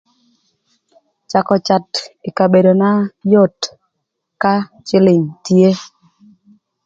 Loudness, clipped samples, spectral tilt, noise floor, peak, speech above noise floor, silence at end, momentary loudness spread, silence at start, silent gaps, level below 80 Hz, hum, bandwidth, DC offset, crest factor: -14 LUFS; under 0.1%; -6.5 dB/octave; -74 dBFS; 0 dBFS; 61 dB; 1 s; 12 LU; 1.3 s; none; -60 dBFS; none; 7.6 kHz; under 0.1%; 16 dB